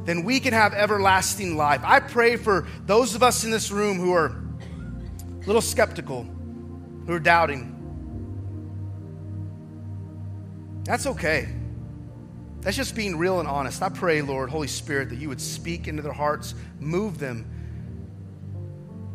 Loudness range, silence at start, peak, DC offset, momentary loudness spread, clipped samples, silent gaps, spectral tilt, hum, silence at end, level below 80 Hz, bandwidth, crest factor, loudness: 10 LU; 0 s; -2 dBFS; under 0.1%; 19 LU; under 0.1%; none; -4 dB/octave; none; 0 s; -46 dBFS; 15.5 kHz; 24 dB; -23 LUFS